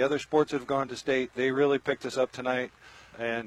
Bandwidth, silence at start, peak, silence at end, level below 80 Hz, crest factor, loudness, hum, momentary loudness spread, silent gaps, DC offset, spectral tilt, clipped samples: 12 kHz; 0 s; -12 dBFS; 0 s; -66 dBFS; 18 dB; -29 LUFS; none; 7 LU; none; under 0.1%; -5 dB/octave; under 0.1%